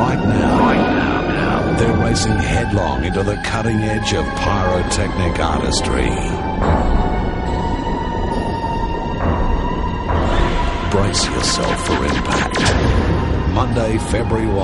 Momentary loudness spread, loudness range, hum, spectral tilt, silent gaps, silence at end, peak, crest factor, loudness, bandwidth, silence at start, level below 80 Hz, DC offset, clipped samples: 5 LU; 3 LU; none; -5.5 dB/octave; none; 0 s; -2 dBFS; 14 dB; -18 LUFS; 11.5 kHz; 0 s; -24 dBFS; under 0.1%; under 0.1%